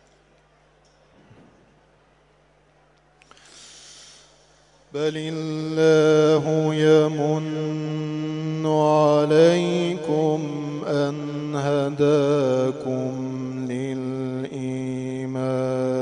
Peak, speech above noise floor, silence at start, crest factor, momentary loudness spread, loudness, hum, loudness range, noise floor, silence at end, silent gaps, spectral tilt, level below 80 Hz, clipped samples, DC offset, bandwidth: -4 dBFS; 40 dB; 3.55 s; 18 dB; 12 LU; -22 LUFS; none; 7 LU; -58 dBFS; 0 s; none; -6.5 dB/octave; -66 dBFS; under 0.1%; under 0.1%; 11 kHz